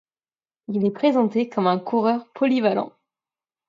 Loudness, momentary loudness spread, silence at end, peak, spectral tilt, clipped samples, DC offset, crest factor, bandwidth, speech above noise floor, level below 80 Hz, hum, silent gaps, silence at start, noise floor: -22 LUFS; 6 LU; 0.8 s; -6 dBFS; -8 dB/octave; under 0.1%; under 0.1%; 18 dB; 7.2 kHz; over 69 dB; -74 dBFS; none; none; 0.7 s; under -90 dBFS